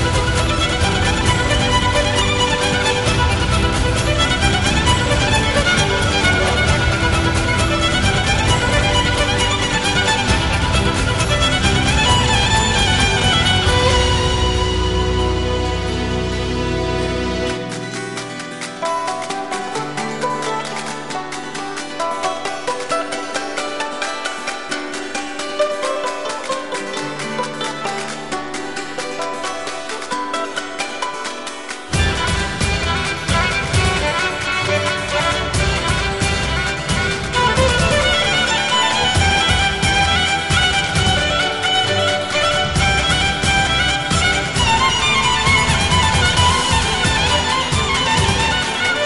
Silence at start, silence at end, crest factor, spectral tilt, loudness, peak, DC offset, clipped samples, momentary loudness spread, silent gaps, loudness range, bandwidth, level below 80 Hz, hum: 0 s; 0 s; 16 dB; -3.5 dB/octave; -17 LUFS; -2 dBFS; 0.9%; under 0.1%; 10 LU; none; 9 LU; 11.5 kHz; -26 dBFS; none